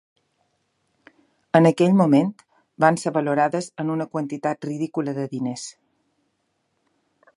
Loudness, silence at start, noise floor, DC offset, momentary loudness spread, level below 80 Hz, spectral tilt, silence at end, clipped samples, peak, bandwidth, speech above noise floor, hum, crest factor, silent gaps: -21 LUFS; 1.55 s; -72 dBFS; under 0.1%; 12 LU; -72 dBFS; -7 dB/octave; 1.65 s; under 0.1%; 0 dBFS; 11.5 kHz; 52 dB; none; 22 dB; none